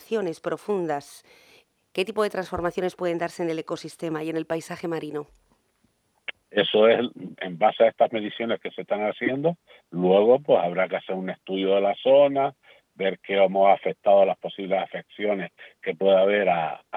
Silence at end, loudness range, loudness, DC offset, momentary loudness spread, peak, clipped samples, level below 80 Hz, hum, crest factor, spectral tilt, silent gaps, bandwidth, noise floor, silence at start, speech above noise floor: 0 s; 7 LU; -24 LUFS; under 0.1%; 13 LU; -6 dBFS; under 0.1%; -64 dBFS; none; 18 dB; -6 dB/octave; none; 13.5 kHz; -68 dBFS; 0.1 s; 45 dB